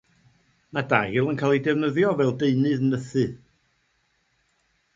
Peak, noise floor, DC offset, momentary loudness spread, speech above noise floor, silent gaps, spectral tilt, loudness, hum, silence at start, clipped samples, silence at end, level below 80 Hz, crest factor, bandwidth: -2 dBFS; -69 dBFS; under 0.1%; 6 LU; 47 dB; none; -7.5 dB/octave; -23 LUFS; none; 0.75 s; under 0.1%; 1.6 s; -60 dBFS; 22 dB; 7.8 kHz